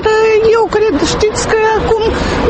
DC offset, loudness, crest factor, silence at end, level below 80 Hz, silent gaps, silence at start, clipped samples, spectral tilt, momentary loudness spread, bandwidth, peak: under 0.1%; -11 LUFS; 10 dB; 0 s; -26 dBFS; none; 0 s; under 0.1%; -4.5 dB/octave; 4 LU; 8.8 kHz; 0 dBFS